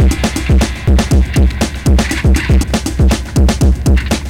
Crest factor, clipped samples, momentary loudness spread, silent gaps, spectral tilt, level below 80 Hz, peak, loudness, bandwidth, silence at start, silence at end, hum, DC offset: 8 dB; under 0.1%; 2 LU; none; -5.5 dB/octave; -12 dBFS; -4 dBFS; -13 LUFS; 15 kHz; 0 s; 0 s; none; 0.6%